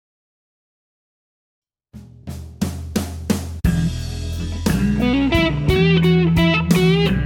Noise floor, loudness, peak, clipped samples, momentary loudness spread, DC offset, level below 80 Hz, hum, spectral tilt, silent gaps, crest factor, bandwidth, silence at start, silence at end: -42 dBFS; -18 LUFS; -2 dBFS; under 0.1%; 12 LU; under 0.1%; -30 dBFS; none; -6.5 dB/octave; none; 16 dB; 17 kHz; 1.95 s; 0 s